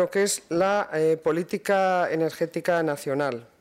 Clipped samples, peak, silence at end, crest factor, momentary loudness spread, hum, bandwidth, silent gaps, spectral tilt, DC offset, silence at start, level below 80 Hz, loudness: under 0.1%; -12 dBFS; 0.15 s; 12 dB; 5 LU; none; 16 kHz; none; -4.5 dB/octave; under 0.1%; 0 s; -68 dBFS; -25 LUFS